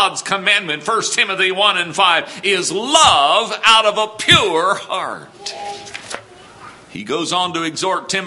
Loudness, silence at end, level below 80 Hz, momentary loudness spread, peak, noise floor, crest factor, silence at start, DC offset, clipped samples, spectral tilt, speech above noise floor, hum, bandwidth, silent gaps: -14 LUFS; 0 s; -50 dBFS; 18 LU; 0 dBFS; -39 dBFS; 16 dB; 0 s; under 0.1%; under 0.1%; -1.5 dB/octave; 23 dB; none; 16 kHz; none